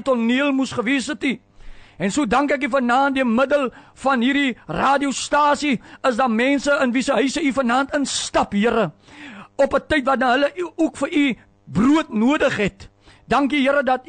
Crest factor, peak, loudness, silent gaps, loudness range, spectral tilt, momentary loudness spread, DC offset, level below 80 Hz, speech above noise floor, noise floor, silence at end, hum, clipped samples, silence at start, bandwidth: 12 dB; -8 dBFS; -19 LUFS; none; 2 LU; -4.5 dB/octave; 6 LU; under 0.1%; -48 dBFS; 20 dB; -39 dBFS; 0.05 s; none; under 0.1%; 0 s; 9.4 kHz